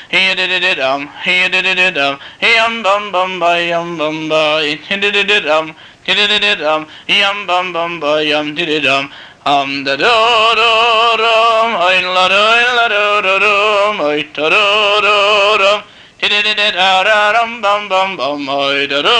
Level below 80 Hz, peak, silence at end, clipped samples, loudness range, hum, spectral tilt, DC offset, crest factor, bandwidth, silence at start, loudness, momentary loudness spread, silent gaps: -54 dBFS; -2 dBFS; 0 s; under 0.1%; 4 LU; none; -2.5 dB/octave; under 0.1%; 12 dB; 10.5 kHz; 0 s; -11 LUFS; 7 LU; none